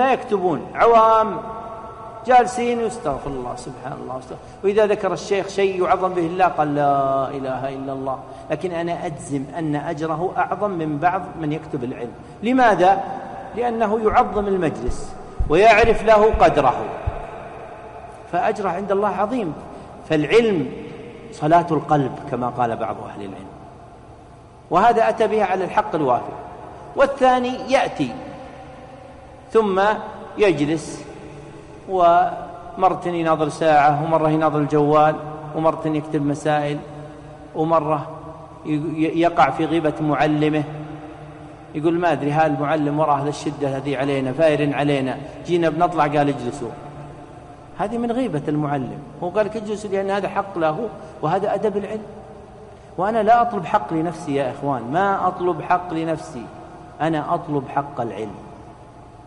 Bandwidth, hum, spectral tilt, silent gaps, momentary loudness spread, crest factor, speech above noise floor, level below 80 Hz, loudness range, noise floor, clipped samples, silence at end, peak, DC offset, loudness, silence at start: 11 kHz; none; -6.5 dB/octave; none; 20 LU; 16 dB; 24 dB; -42 dBFS; 6 LU; -43 dBFS; under 0.1%; 0.05 s; -4 dBFS; under 0.1%; -20 LUFS; 0 s